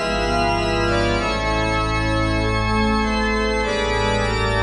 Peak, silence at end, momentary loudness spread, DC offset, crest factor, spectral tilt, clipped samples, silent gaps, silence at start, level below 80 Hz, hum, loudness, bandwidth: -6 dBFS; 0 s; 1 LU; 0.1%; 14 dB; -5 dB/octave; under 0.1%; none; 0 s; -28 dBFS; none; -20 LUFS; 11.5 kHz